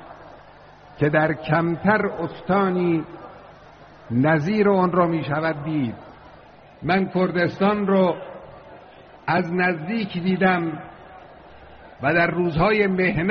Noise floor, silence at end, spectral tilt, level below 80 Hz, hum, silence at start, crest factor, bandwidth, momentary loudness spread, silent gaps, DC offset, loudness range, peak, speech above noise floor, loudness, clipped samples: -47 dBFS; 0 s; -5.5 dB/octave; -50 dBFS; none; 0 s; 18 dB; 6.4 kHz; 14 LU; none; under 0.1%; 2 LU; -6 dBFS; 26 dB; -21 LUFS; under 0.1%